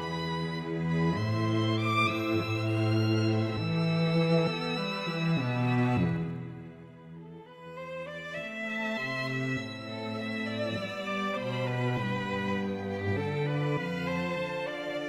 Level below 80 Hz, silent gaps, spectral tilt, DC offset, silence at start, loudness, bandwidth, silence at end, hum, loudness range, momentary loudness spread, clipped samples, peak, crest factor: -62 dBFS; none; -7 dB/octave; under 0.1%; 0 s; -30 LUFS; 12.5 kHz; 0 s; none; 7 LU; 12 LU; under 0.1%; -14 dBFS; 16 dB